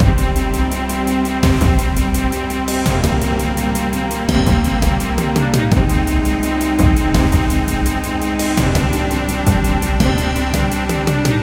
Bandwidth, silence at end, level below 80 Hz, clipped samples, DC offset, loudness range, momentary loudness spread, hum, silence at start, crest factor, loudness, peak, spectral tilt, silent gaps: 17 kHz; 0 s; -20 dBFS; under 0.1%; under 0.1%; 1 LU; 4 LU; none; 0 s; 16 dB; -17 LUFS; 0 dBFS; -5.5 dB/octave; none